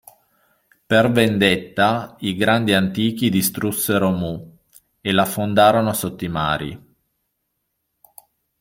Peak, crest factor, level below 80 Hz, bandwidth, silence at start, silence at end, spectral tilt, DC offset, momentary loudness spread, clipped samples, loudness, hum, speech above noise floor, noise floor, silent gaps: -2 dBFS; 18 dB; -52 dBFS; 16.5 kHz; 0.9 s; 1.85 s; -5 dB/octave; under 0.1%; 10 LU; under 0.1%; -19 LUFS; none; 56 dB; -74 dBFS; none